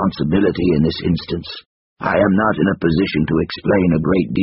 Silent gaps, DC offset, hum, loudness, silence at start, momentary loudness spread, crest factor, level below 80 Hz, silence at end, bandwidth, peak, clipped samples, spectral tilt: 1.66-1.96 s; under 0.1%; none; -17 LUFS; 0 s; 10 LU; 16 dB; -38 dBFS; 0 s; 5.8 kHz; -2 dBFS; under 0.1%; -6 dB/octave